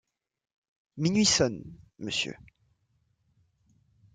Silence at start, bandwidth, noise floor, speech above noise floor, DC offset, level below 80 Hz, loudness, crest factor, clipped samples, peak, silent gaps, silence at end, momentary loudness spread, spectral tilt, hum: 0.95 s; 9.6 kHz; -73 dBFS; 45 dB; under 0.1%; -60 dBFS; -27 LUFS; 22 dB; under 0.1%; -10 dBFS; none; 1.8 s; 16 LU; -3.5 dB/octave; none